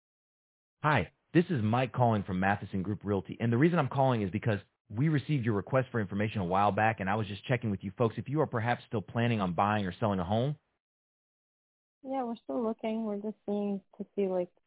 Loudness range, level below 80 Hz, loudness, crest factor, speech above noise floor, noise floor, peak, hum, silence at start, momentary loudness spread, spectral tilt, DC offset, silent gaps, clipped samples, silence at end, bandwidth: 6 LU; -58 dBFS; -31 LUFS; 20 dB; over 60 dB; under -90 dBFS; -12 dBFS; none; 0.85 s; 8 LU; -6.5 dB/octave; under 0.1%; 4.81-4.85 s, 10.80-12.01 s; under 0.1%; 0.2 s; 4 kHz